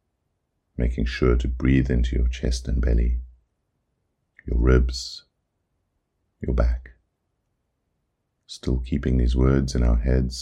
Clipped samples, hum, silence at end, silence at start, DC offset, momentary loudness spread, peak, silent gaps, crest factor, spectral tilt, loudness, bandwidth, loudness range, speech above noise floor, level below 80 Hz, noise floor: under 0.1%; none; 0 s; 0.8 s; under 0.1%; 13 LU; -4 dBFS; none; 20 dB; -7 dB/octave; -24 LUFS; 9.2 kHz; 8 LU; 54 dB; -26 dBFS; -75 dBFS